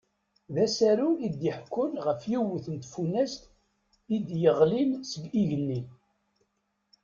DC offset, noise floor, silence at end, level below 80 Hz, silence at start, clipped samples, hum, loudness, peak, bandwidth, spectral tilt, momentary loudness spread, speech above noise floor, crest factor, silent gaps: under 0.1%; -77 dBFS; 1.1 s; -66 dBFS; 0.5 s; under 0.1%; none; -28 LUFS; -10 dBFS; 7.6 kHz; -6.5 dB/octave; 12 LU; 50 dB; 20 dB; none